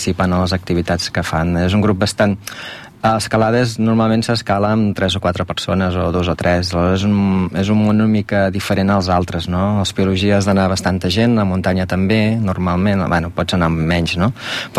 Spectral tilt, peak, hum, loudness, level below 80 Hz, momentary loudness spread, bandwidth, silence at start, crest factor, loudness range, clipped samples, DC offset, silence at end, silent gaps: -6 dB/octave; -4 dBFS; none; -16 LUFS; -38 dBFS; 4 LU; 14.5 kHz; 0 s; 12 dB; 1 LU; under 0.1%; under 0.1%; 0 s; none